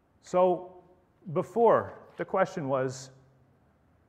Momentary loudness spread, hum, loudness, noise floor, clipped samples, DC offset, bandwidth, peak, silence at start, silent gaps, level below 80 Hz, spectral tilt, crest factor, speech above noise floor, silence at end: 21 LU; none; -28 LUFS; -65 dBFS; under 0.1%; under 0.1%; 9.8 kHz; -10 dBFS; 0.25 s; none; -72 dBFS; -6.5 dB/octave; 20 dB; 38 dB; 1 s